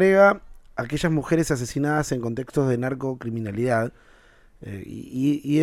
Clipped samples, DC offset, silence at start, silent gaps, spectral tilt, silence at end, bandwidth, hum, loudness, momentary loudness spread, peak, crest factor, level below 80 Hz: under 0.1%; under 0.1%; 0 s; none; -6.5 dB/octave; 0 s; 15.5 kHz; none; -24 LUFS; 16 LU; -6 dBFS; 18 dB; -48 dBFS